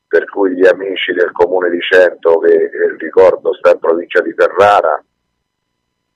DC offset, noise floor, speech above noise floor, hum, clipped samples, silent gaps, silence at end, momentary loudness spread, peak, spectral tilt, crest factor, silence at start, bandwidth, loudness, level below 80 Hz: under 0.1%; -70 dBFS; 59 dB; 60 Hz at -60 dBFS; 0.2%; none; 1.15 s; 7 LU; 0 dBFS; -4.5 dB/octave; 12 dB; 0.1 s; 9.4 kHz; -12 LUFS; -54 dBFS